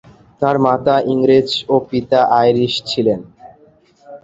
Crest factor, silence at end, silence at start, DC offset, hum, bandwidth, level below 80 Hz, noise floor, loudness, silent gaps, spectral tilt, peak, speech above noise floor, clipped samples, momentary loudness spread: 14 dB; 0.05 s; 0.4 s; under 0.1%; none; 7.8 kHz; -52 dBFS; -50 dBFS; -15 LUFS; none; -6 dB/octave; -2 dBFS; 36 dB; under 0.1%; 5 LU